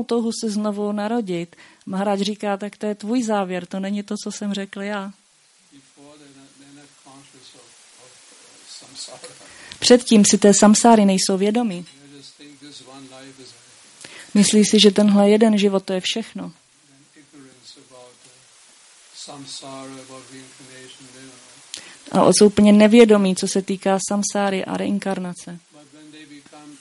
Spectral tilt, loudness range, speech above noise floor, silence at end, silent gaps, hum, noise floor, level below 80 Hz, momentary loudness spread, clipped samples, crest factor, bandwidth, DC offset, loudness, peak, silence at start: -4.5 dB/octave; 22 LU; 38 dB; 0.1 s; none; none; -57 dBFS; -62 dBFS; 26 LU; under 0.1%; 20 dB; 11.5 kHz; under 0.1%; -17 LUFS; 0 dBFS; 0 s